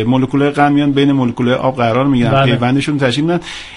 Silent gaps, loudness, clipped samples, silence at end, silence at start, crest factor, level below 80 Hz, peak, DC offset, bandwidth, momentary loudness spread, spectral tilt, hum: none; -13 LUFS; under 0.1%; 0 s; 0 s; 12 dB; -42 dBFS; 0 dBFS; under 0.1%; 11 kHz; 3 LU; -7 dB/octave; none